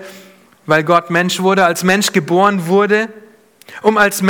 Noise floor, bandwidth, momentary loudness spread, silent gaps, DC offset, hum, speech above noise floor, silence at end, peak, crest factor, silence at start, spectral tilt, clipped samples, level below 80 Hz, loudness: -43 dBFS; 18.5 kHz; 4 LU; none; under 0.1%; none; 30 dB; 0 s; 0 dBFS; 14 dB; 0 s; -4.5 dB/octave; under 0.1%; -56 dBFS; -13 LUFS